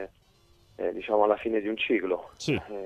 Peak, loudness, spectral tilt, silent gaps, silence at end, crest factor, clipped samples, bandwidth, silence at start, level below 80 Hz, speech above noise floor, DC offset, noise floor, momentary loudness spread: -10 dBFS; -28 LUFS; -5.5 dB/octave; none; 0 s; 20 dB; under 0.1%; 12 kHz; 0 s; -60 dBFS; 34 dB; under 0.1%; -62 dBFS; 9 LU